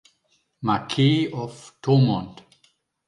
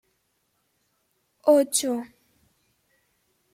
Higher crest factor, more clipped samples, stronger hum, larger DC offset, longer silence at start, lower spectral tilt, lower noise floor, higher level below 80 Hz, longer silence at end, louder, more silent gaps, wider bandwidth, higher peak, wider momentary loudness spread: second, 16 dB vs 22 dB; neither; neither; neither; second, 0.6 s vs 1.45 s; first, -7 dB/octave vs -2 dB/octave; second, -68 dBFS vs -73 dBFS; first, -60 dBFS vs -78 dBFS; second, 0.75 s vs 1.5 s; about the same, -22 LUFS vs -23 LUFS; neither; second, 11 kHz vs 16.5 kHz; about the same, -8 dBFS vs -8 dBFS; about the same, 14 LU vs 14 LU